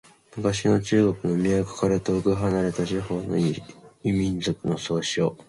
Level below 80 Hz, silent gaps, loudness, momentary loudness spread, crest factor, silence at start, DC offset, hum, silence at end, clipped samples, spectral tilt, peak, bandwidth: -48 dBFS; none; -25 LUFS; 6 LU; 16 dB; 0.35 s; under 0.1%; none; 0.05 s; under 0.1%; -6 dB/octave; -8 dBFS; 11.5 kHz